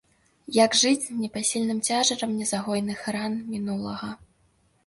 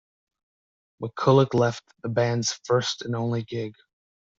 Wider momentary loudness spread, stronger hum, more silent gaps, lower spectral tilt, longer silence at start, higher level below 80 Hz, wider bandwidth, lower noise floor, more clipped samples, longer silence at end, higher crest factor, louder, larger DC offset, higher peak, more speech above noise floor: second, 11 LU vs 16 LU; neither; neither; second, -3 dB/octave vs -5.5 dB/octave; second, 0.5 s vs 1 s; about the same, -64 dBFS vs -62 dBFS; first, 11.5 kHz vs 7.8 kHz; second, -65 dBFS vs under -90 dBFS; neither; about the same, 0.7 s vs 0.65 s; about the same, 18 dB vs 20 dB; about the same, -25 LUFS vs -24 LUFS; neither; about the same, -8 dBFS vs -6 dBFS; second, 40 dB vs over 66 dB